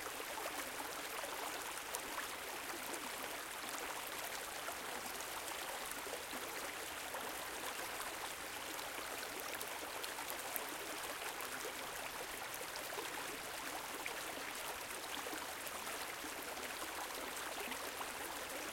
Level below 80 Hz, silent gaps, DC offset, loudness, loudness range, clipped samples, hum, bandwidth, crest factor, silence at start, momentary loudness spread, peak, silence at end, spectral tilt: -72 dBFS; none; under 0.1%; -44 LUFS; 0 LU; under 0.1%; none; 17 kHz; 28 dB; 0 s; 1 LU; -18 dBFS; 0 s; -0.5 dB/octave